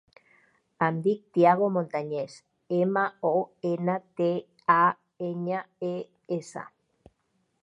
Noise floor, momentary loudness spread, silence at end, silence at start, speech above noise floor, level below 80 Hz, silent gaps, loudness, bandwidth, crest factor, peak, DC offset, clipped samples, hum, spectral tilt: -74 dBFS; 13 LU; 1 s; 0.8 s; 48 dB; -76 dBFS; none; -27 LUFS; 10.5 kHz; 22 dB; -6 dBFS; under 0.1%; under 0.1%; none; -7.5 dB/octave